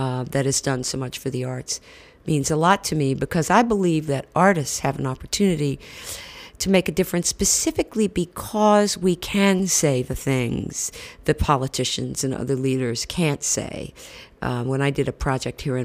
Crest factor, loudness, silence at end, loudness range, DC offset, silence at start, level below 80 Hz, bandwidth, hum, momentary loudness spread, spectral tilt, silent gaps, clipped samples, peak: 18 dB; -22 LUFS; 0 s; 4 LU; under 0.1%; 0 s; -42 dBFS; 16 kHz; none; 10 LU; -4.5 dB/octave; none; under 0.1%; -4 dBFS